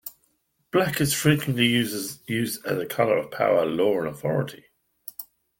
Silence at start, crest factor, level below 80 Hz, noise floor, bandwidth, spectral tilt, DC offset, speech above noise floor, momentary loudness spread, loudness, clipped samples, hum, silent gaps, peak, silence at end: 0.05 s; 20 dB; -58 dBFS; -70 dBFS; 17 kHz; -4.5 dB/octave; under 0.1%; 46 dB; 17 LU; -24 LUFS; under 0.1%; none; none; -6 dBFS; 0.35 s